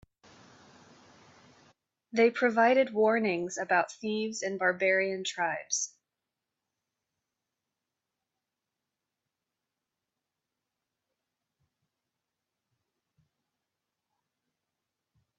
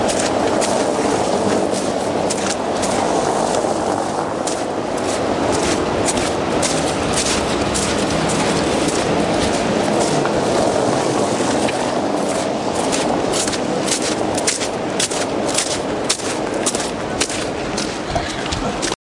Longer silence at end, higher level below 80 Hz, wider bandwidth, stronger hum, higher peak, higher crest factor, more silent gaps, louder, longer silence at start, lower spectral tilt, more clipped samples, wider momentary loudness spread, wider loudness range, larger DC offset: first, 9.5 s vs 0.05 s; second, -80 dBFS vs -40 dBFS; second, 8.4 kHz vs 11.5 kHz; neither; second, -12 dBFS vs 0 dBFS; about the same, 22 dB vs 18 dB; neither; second, -28 LUFS vs -18 LUFS; first, 2.15 s vs 0 s; about the same, -3 dB/octave vs -3.5 dB/octave; neither; first, 9 LU vs 4 LU; first, 10 LU vs 2 LU; neither